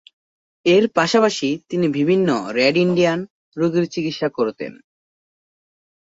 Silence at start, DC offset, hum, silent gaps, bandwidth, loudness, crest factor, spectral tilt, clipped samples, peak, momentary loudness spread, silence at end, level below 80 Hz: 0.65 s; under 0.1%; none; 3.30-3.52 s; 8 kHz; -19 LUFS; 18 dB; -5.5 dB/octave; under 0.1%; -2 dBFS; 8 LU; 1.4 s; -62 dBFS